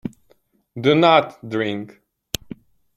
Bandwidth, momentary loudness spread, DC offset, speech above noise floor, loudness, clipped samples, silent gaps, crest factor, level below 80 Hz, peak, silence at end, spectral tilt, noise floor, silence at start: 16.5 kHz; 25 LU; under 0.1%; 43 dB; -19 LUFS; under 0.1%; none; 20 dB; -52 dBFS; 0 dBFS; 1.1 s; -5 dB/octave; -61 dBFS; 0.05 s